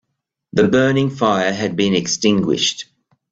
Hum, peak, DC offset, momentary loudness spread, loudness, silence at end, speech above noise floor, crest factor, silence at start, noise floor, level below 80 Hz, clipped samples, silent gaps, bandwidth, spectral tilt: none; -2 dBFS; under 0.1%; 6 LU; -17 LUFS; 0.5 s; 60 dB; 16 dB; 0.55 s; -76 dBFS; -54 dBFS; under 0.1%; none; 8 kHz; -4.5 dB/octave